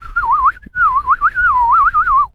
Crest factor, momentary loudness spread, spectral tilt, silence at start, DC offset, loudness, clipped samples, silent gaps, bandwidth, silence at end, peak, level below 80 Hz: 10 dB; 5 LU; -4.5 dB/octave; 0 s; under 0.1%; -13 LUFS; under 0.1%; none; 5.6 kHz; 0.05 s; -4 dBFS; -34 dBFS